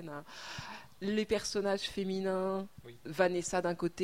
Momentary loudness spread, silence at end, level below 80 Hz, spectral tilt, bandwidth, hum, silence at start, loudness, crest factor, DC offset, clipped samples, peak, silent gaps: 14 LU; 0 s; -62 dBFS; -4.5 dB/octave; 16 kHz; none; 0 s; -35 LUFS; 20 dB; 0.1%; under 0.1%; -16 dBFS; none